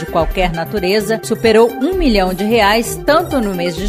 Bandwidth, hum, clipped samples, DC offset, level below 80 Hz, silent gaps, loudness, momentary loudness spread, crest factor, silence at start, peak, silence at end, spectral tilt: 16 kHz; none; under 0.1%; under 0.1%; -28 dBFS; none; -14 LUFS; 6 LU; 14 dB; 0 s; 0 dBFS; 0 s; -5 dB/octave